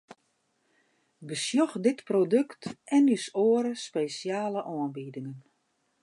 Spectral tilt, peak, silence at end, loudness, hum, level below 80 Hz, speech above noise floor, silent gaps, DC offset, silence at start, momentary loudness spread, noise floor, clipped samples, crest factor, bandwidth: -5 dB/octave; -12 dBFS; 0.65 s; -28 LUFS; none; -80 dBFS; 47 dB; none; under 0.1%; 1.2 s; 15 LU; -74 dBFS; under 0.1%; 16 dB; 11.5 kHz